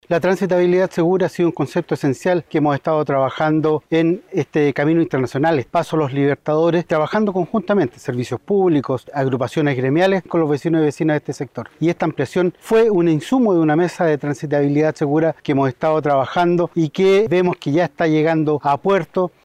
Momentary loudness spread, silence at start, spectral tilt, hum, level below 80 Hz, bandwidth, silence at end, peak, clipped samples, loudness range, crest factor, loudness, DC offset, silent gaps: 6 LU; 0.1 s; -7.5 dB/octave; none; -58 dBFS; 13.5 kHz; 0.15 s; -6 dBFS; under 0.1%; 2 LU; 12 dB; -18 LUFS; under 0.1%; none